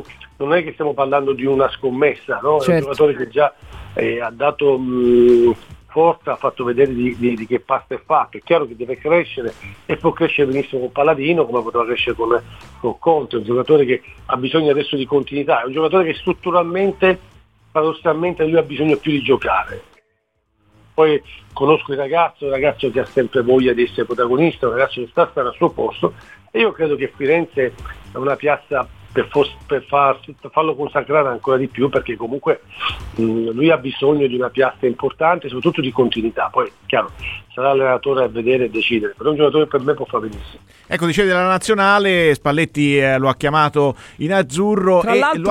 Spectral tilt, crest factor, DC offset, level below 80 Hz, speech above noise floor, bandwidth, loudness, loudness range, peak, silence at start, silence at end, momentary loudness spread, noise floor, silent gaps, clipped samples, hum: -6 dB/octave; 16 dB; 0.1%; -46 dBFS; 50 dB; 12.5 kHz; -17 LUFS; 3 LU; 0 dBFS; 0 s; 0 s; 8 LU; -67 dBFS; none; under 0.1%; none